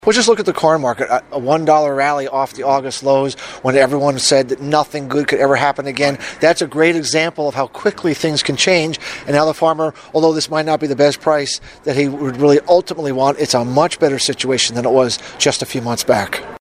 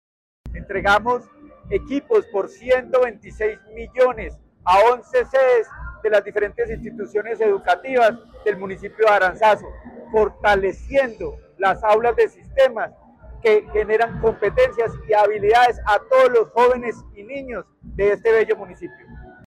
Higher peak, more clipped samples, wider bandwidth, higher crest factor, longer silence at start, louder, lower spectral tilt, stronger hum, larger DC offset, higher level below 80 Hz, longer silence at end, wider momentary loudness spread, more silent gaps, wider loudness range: first, 0 dBFS vs -6 dBFS; neither; first, 15.5 kHz vs 12.5 kHz; about the same, 16 dB vs 12 dB; second, 0.05 s vs 0.45 s; first, -15 LUFS vs -19 LUFS; about the same, -4 dB/octave vs -5 dB/octave; neither; neither; second, -54 dBFS vs -42 dBFS; second, 0.05 s vs 0.2 s; second, 6 LU vs 16 LU; neither; second, 1 LU vs 4 LU